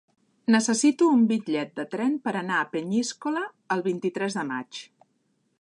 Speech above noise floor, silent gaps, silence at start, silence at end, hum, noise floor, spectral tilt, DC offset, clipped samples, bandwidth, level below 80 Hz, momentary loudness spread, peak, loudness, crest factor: 46 dB; none; 0.5 s; 0.75 s; none; -71 dBFS; -4.5 dB/octave; under 0.1%; under 0.1%; 11 kHz; -80 dBFS; 12 LU; -8 dBFS; -25 LUFS; 18 dB